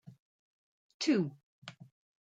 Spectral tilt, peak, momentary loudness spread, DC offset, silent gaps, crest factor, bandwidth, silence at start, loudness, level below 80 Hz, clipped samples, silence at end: -5 dB/octave; -18 dBFS; 21 LU; under 0.1%; 0.19-1.00 s, 1.43-1.62 s; 20 dB; 9.2 kHz; 0.05 s; -33 LUFS; -86 dBFS; under 0.1%; 0.55 s